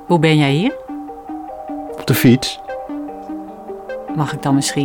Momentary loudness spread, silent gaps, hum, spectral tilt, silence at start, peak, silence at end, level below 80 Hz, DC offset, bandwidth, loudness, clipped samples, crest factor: 17 LU; none; none; -5.5 dB/octave; 0 s; -2 dBFS; 0 s; -50 dBFS; under 0.1%; over 20 kHz; -17 LUFS; under 0.1%; 16 dB